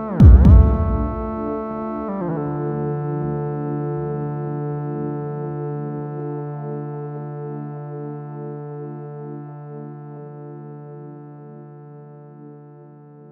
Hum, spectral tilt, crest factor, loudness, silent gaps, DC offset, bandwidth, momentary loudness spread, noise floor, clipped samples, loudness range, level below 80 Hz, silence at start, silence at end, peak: none; -11.5 dB/octave; 20 dB; -21 LUFS; none; under 0.1%; 3 kHz; 21 LU; -43 dBFS; under 0.1%; 16 LU; -24 dBFS; 0 s; 0 s; 0 dBFS